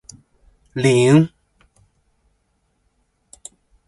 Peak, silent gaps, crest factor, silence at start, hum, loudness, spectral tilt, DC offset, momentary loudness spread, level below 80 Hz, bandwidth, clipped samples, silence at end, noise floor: -2 dBFS; none; 20 dB; 0.75 s; none; -16 LUFS; -6.5 dB/octave; under 0.1%; 27 LU; -56 dBFS; 11.5 kHz; under 0.1%; 2.6 s; -67 dBFS